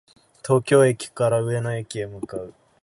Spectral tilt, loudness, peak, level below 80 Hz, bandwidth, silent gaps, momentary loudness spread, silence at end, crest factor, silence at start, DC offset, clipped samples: -6 dB/octave; -22 LUFS; -6 dBFS; -58 dBFS; 11.5 kHz; none; 17 LU; 0.35 s; 18 dB; 0.45 s; under 0.1%; under 0.1%